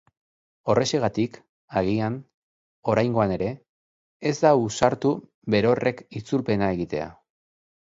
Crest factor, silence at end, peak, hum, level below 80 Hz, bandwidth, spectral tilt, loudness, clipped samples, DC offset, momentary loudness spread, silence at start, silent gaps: 22 dB; 0.8 s; -4 dBFS; none; -54 dBFS; 8 kHz; -6 dB/octave; -24 LUFS; under 0.1%; under 0.1%; 11 LU; 0.65 s; 1.49-1.68 s, 2.34-2.83 s, 3.69-4.20 s, 5.34-5.42 s